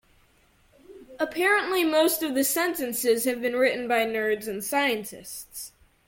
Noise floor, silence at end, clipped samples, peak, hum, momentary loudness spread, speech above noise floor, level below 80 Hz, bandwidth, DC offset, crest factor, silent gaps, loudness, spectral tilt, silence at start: -62 dBFS; 0.4 s; under 0.1%; -10 dBFS; none; 15 LU; 36 dB; -64 dBFS; 17 kHz; under 0.1%; 16 dB; none; -24 LUFS; -2 dB/octave; 0.9 s